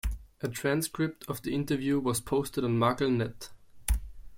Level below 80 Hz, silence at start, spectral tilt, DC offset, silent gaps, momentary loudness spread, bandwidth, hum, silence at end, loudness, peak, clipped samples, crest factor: -40 dBFS; 0.05 s; -5.5 dB/octave; under 0.1%; none; 11 LU; 16.5 kHz; none; 0 s; -31 LUFS; -12 dBFS; under 0.1%; 18 dB